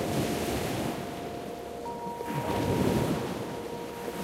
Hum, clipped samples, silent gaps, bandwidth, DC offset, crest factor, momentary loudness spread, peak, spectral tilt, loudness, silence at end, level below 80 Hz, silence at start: none; under 0.1%; none; 16 kHz; under 0.1%; 18 dB; 10 LU; -12 dBFS; -5.5 dB/octave; -32 LUFS; 0 s; -50 dBFS; 0 s